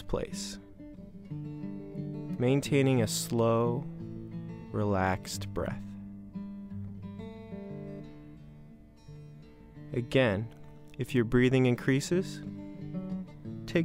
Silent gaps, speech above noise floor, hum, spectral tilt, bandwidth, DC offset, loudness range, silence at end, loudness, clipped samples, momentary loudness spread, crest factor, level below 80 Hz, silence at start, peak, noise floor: none; 24 dB; none; -6 dB/octave; 16 kHz; under 0.1%; 14 LU; 0 s; -31 LUFS; under 0.1%; 23 LU; 20 dB; -52 dBFS; 0 s; -12 dBFS; -52 dBFS